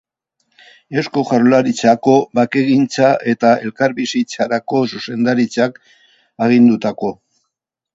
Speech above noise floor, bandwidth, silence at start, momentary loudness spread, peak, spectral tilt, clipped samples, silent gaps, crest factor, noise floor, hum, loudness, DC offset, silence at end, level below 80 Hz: 62 dB; 7.8 kHz; 0.9 s; 8 LU; 0 dBFS; -6 dB/octave; under 0.1%; none; 16 dB; -77 dBFS; none; -15 LUFS; under 0.1%; 0.8 s; -60 dBFS